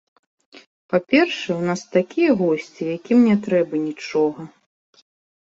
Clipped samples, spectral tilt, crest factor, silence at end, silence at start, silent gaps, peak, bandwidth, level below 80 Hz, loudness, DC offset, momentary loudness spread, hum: under 0.1%; -6 dB/octave; 18 dB; 1.1 s; 0.9 s; none; -4 dBFS; 7.8 kHz; -64 dBFS; -20 LUFS; under 0.1%; 9 LU; none